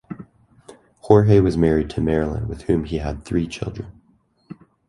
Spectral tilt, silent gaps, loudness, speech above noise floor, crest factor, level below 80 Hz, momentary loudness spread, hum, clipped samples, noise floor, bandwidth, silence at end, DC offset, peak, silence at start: -8.5 dB/octave; none; -20 LUFS; 42 dB; 20 dB; -36 dBFS; 20 LU; none; under 0.1%; -60 dBFS; 11.5 kHz; 0.35 s; under 0.1%; 0 dBFS; 0.1 s